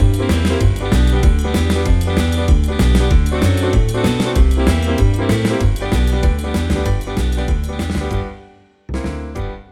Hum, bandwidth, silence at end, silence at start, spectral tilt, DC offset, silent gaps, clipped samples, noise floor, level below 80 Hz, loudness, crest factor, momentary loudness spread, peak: none; 14.5 kHz; 0.1 s; 0 s; -6.5 dB/octave; under 0.1%; none; under 0.1%; -45 dBFS; -18 dBFS; -17 LUFS; 14 dB; 10 LU; -2 dBFS